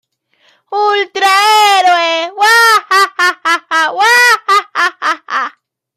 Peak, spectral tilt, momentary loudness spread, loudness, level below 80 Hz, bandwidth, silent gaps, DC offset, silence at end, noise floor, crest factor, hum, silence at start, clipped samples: 0 dBFS; 1.5 dB/octave; 9 LU; -10 LUFS; -74 dBFS; 16 kHz; none; under 0.1%; 0.45 s; -54 dBFS; 12 dB; none; 0.7 s; under 0.1%